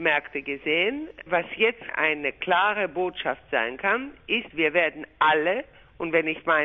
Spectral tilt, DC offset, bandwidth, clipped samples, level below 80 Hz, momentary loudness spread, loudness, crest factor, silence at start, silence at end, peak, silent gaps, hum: -6 dB/octave; under 0.1%; 6 kHz; under 0.1%; -60 dBFS; 6 LU; -25 LUFS; 18 dB; 0 s; 0 s; -6 dBFS; none; none